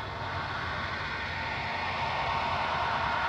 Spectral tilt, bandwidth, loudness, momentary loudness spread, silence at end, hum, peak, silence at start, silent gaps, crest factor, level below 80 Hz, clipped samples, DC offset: -4.5 dB/octave; 10.5 kHz; -31 LUFS; 4 LU; 0 s; none; -18 dBFS; 0 s; none; 14 dB; -50 dBFS; under 0.1%; under 0.1%